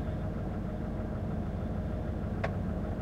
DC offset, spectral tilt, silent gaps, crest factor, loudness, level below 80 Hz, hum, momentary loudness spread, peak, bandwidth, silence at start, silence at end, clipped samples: under 0.1%; -9 dB/octave; none; 14 dB; -36 LUFS; -40 dBFS; none; 2 LU; -20 dBFS; 8.8 kHz; 0 s; 0 s; under 0.1%